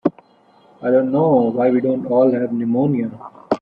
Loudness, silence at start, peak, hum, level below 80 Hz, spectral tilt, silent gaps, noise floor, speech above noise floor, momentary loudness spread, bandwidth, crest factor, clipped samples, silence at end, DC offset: -18 LUFS; 0.05 s; -2 dBFS; none; -62 dBFS; -10.5 dB/octave; none; -52 dBFS; 36 dB; 9 LU; 5.4 kHz; 16 dB; under 0.1%; 0.05 s; under 0.1%